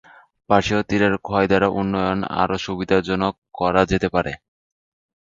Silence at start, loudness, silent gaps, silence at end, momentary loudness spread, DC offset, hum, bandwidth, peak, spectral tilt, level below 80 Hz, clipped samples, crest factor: 0.5 s; -20 LUFS; 3.38-3.42 s; 0.9 s; 6 LU; under 0.1%; none; 7.6 kHz; 0 dBFS; -6 dB/octave; -44 dBFS; under 0.1%; 20 dB